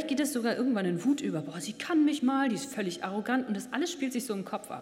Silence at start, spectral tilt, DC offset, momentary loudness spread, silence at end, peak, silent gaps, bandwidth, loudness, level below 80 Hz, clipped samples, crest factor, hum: 0 s; -4.5 dB/octave; under 0.1%; 8 LU; 0 s; -14 dBFS; none; 16 kHz; -31 LUFS; -76 dBFS; under 0.1%; 16 dB; none